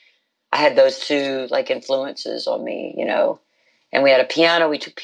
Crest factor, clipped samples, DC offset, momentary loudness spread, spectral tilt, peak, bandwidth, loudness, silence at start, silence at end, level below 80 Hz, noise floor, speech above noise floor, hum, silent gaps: 16 dB; under 0.1%; under 0.1%; 11 LU; -3.5 dB/octave; -2 dBFS; 9.2 kHz; -19 LUFS; 0.5 s; 0 s; -84 dBFS; -61 dBFS; 42 dB; none; none